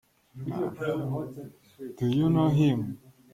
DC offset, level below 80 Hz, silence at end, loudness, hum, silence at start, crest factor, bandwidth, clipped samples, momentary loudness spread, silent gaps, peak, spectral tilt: under 0.1%; -58 dBFS; 0.25 s; -28 LUFS; none; 0.35 s; 16 dB; 15 kHz; under 0.1%; 21 LU; none; -12 dBFS; -8.5 dB/octave